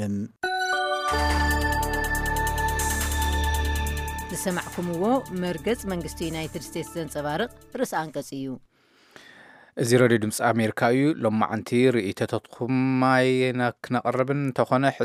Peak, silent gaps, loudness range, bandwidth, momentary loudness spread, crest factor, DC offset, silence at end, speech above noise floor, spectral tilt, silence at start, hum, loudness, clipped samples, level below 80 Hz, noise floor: -4 dBFS; none; 7 LU; 16 kHz; 10 LU; 20 dB; under 0.1%; 0 s; 30 dB; -5 dB/octave; 0 s; none; -25 LUFS; under 0.1%; -36 dBFS; -54 dBFS